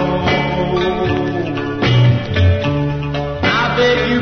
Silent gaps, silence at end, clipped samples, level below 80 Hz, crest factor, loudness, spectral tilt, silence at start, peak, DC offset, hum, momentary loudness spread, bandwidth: none; 0 s; under 0.1%; -32 dBFS; 12 dB; -16 LUFS; -7 dB/octave; 0 s; -2 dBFS; 0.7%; none; 7 LU; 6.4 kHz